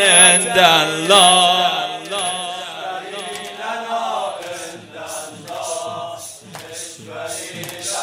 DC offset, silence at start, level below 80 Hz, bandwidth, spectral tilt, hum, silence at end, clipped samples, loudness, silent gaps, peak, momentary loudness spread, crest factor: under 0.1%; 0 s; -64 dBFS; over 20 kHz; -0.5 dB/octave; none; 0 s; under 0.1%; -15 LUFS; none; 0 dBFS; 21 LU; 18 dB